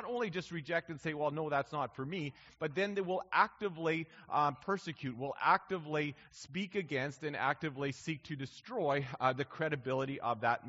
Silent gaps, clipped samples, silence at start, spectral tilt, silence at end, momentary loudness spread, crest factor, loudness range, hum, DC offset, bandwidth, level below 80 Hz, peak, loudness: none; under 0.1%; 0 s; -4 dB/octave; 0 s; 10 LU; 22 dB; 3 LU; none; under 0.1%; 7.6 kHz; -74 dBFS; -14 dBFS; -36 LUFS